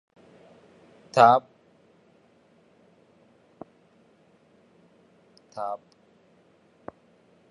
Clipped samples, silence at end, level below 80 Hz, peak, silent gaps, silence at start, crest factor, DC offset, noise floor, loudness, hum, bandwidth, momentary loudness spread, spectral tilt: under 0.1%; 1.75 s; -76 dBFS; -4 dBFS; none; 1.15 s; 26 dB; under 0.1%; -61 dBFS; -22 LUFS; none; 10.5 kHz; 31 LU; -5.5 dB/octave